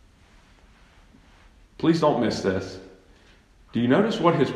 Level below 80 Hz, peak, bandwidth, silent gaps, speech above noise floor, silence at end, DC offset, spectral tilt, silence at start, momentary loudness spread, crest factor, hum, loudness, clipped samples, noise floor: -56 dBFS; -6 dBFS; 11 kHz; none; 33 dB; 0 s; under 0.1%; -6.5 dB/octave; 1.8 s; 11 LU; 20 dB; none; -23 LUFS; under 0.1%; -55 dBFS